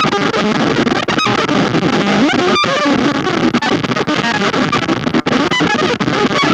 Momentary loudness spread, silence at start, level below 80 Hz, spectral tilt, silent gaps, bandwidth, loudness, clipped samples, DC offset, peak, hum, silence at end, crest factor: 2 LU; 0 s; -44 dBFS; -4.5 dB/octave; none; 11 kHz; -13 LUFS; under 0.1%; under 0.1%; 0 dBFS; none; 0 s; 14 dB